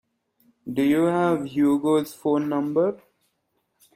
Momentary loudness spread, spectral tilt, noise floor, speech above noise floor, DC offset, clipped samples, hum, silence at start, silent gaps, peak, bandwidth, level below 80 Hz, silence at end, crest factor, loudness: 8 LU; -7 dB/octave; -73 dBFS; 52 dB; under 0.1%; under 0.1%; none; 0.65 s; none; -8 dBFS; 16 kHz; -66 dBFS; 1 s; 16 dB; -23 LUFS